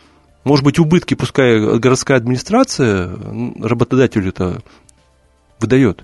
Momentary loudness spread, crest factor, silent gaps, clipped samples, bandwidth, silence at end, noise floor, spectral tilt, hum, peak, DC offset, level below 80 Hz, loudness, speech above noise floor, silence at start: 12 LU; 14 dB; none; under 0.1%; 11.5 kHz; 0.1 s; -54 dBFS; -6 dB/octave; none; 0 dBFS; under 0.1%; -42 dBFS; -15 LUFS; 40 dB; 0.45 s